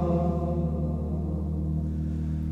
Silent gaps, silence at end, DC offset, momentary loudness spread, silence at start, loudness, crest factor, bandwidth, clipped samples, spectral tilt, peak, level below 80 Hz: none; 0 s; under 0.1%; 4 LU; 0 s; -29 LUFS; 12 dB; 4 kHz; under 0.1%; -11 dB/octave; -14 dBFS; -34 dBFS